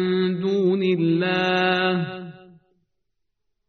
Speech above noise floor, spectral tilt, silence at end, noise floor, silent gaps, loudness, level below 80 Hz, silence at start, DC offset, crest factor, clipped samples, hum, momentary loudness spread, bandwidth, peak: 58 dB; -4.5 dB/octave; 1.3 s; -79 dBFS; none; -21 LUFS; -66 dBFS; 0 s; under 0.1%; 16 dB; under 0.1%; none; 11 LU; 6.4 kHz; -8 dBFS